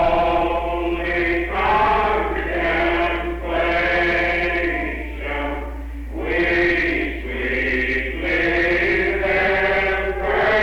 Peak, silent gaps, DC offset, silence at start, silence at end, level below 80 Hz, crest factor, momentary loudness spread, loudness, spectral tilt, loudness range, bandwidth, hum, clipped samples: -6 dBFS; none; under 0.1%; 0 s; 0 s; -30 dBFS; 12 dB; 8 LU; -19 LUFS; -6.5 dB/octave; 3 LU; 16 kHz; none; under 0.1%